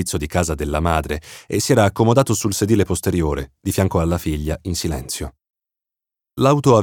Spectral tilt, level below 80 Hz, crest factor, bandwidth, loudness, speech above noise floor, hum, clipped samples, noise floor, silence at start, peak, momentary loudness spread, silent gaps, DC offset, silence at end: -5.5 dB/octave; -34 dBFS; 18 dB; 18.5 kHz; -19 LUFS; 69 dB; none; under 0.1%; -87 dBFS; 0 s; -2 dBFS; 11 LU; none; under 0.1%; 0 s